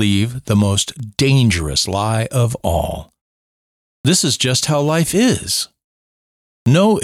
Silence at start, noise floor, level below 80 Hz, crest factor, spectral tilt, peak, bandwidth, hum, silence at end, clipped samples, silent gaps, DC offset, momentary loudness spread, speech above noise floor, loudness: 0 s; under -90 dBFS; -38 dBFS; 14 dB; -4.5 dB/octave; -2 dBFS; 16 kHz; none; 0 s; under 0.1%; 3.21-4.04 s, 5.84-6.66 s; under 0.1%; 8 LU; over 74 dB; -16 LUFS